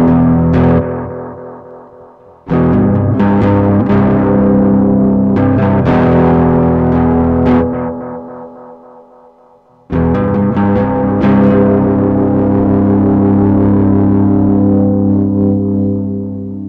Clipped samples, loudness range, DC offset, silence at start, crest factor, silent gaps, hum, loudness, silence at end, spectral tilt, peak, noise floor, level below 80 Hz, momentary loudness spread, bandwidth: under 0.1%; 6 LU; under 0.1%; 0 s; 10 dB; none; none; -11 LUFS; 0 s; -11.5 dB/octave; 0 dBFS; -45 dBFS; -30 dBFS; 11 LU; 4.5 kHz